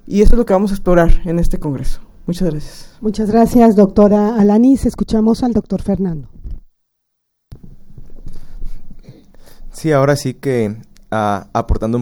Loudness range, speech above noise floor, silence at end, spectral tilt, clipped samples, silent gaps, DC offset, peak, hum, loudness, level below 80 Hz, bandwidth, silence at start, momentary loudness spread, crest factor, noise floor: 12 LU; 58 dB; 0 s; -7.5 dB/octave; under 0.1%; none; under 0.1%; 0 dBFS; none; -14 LUFS; -22 dBFS; 16 kHz; 0.05 s; 19 LU; 14 dB; -70 dBFS